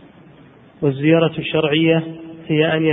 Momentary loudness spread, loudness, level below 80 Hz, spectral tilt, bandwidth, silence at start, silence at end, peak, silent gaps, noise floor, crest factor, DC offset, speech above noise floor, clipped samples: 7 LU; -17 LUFS; -56 dBFS; -11 dB/octave; 3.9 kHz; 0.8 s; 0 s; -2 dBFS; none; -45 dBFS; 16 dB; under 0.1%; 29 dB; under 0.1%